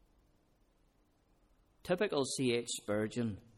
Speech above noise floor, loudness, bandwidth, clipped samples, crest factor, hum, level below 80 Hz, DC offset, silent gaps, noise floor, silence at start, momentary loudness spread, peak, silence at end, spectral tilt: 36 dB; -35 LUFS; 15 kHz; under 0.1%; 18 dB; none; -68 dBFS; under 0.1%; none; -72 dBFS; 1.85 s; 5 LU; -20 dBFS; 0.15 s; -4.5 dB/octave